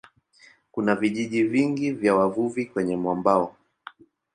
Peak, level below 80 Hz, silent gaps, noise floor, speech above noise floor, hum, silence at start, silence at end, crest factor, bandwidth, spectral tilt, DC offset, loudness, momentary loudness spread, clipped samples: -6 dBFS; -64 dBFS; none; -56 dBFS; 33 dB; none; 0.75 s; 0.85 s; 20 dB; 10.5 kHz; -6.5 dB/octave; under 0.1%; -24 LUFS; 6 LU; under 0.1%